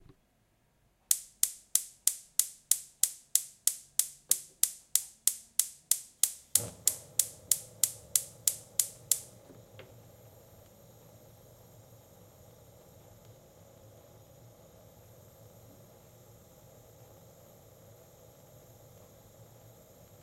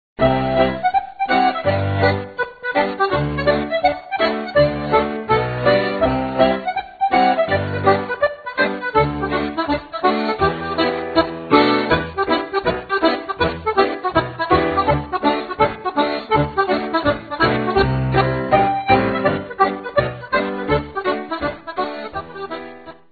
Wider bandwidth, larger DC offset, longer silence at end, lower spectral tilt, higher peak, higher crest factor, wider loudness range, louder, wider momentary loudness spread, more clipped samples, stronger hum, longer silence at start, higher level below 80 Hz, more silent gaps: first, 16 kHz vs 4.9 kHz; neither; first, 10.4 s vs 0.2 s; second, 0.5 dB/octave vs -8.5 dB/octave; about the same, -2 dBFS vs 0 dBFS; first, 36 dB vs 18 dB; first, 6 LU vs 2 LU; second, -30 LUFS vs -19 LUFS; about the same, 4 LU vs 6 LU; neither; neither; first, 1.1 s vs 0.2 s; second, -70 dBFS vs -40 dBFS; neither